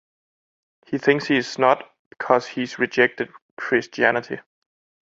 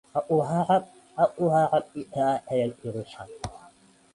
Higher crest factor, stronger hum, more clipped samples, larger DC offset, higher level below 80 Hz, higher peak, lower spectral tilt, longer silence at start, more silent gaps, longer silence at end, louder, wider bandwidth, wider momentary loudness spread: about the same, 22 dB vs 18 dB; neither; neither; neither; second, -66 dBFS vs -58 dBFS; first, -2 dBFS vs -10 dBFS; second, -5 dB/octave vs -7 dB/octave; first, 0.9 s vs 0.15 s; first, 1.99-2.11 s, 3.42-3.57 s vs none; first, 0.75 s vs 0.55 s; first, -21 LUFS vs -26 LUFS; second, 7.8 kHz vs 11.5 kHz; second, 13 LU vs 16 LU